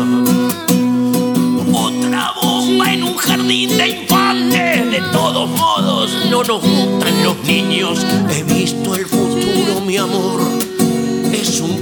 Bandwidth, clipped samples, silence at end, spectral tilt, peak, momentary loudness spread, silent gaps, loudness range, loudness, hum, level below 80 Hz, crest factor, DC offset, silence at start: over 20 kHz; under 0.1%; 0 s; -4 dB/octave; 0 dBFS; 3 LU; none; 2 LU; -14 LUFS; none; -52 dBFS; 14 dB; under 0.1%; 0 s